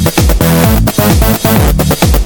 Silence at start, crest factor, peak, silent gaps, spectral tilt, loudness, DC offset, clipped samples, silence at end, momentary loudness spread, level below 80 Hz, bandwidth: 0 s; 8 dB; 0 dBFS; none; -5 dB/octave; -9 LUFS; under 0.1%; 0.3%; 0 s; 2 LU; -14 dBFS; 18.5 kHz